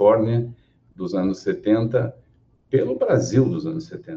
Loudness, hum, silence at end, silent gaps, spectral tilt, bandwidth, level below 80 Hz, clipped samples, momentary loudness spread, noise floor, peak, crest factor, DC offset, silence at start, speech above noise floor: -22 LUFS; none; 0 s; none; -7.5 dB/octave; 7.6 kHz; -56 dBFS; under 0.1%; 12 LU; -58 dBFS; -4 dBFS; 18 dB; under 0.1%; 0 s; 38 dB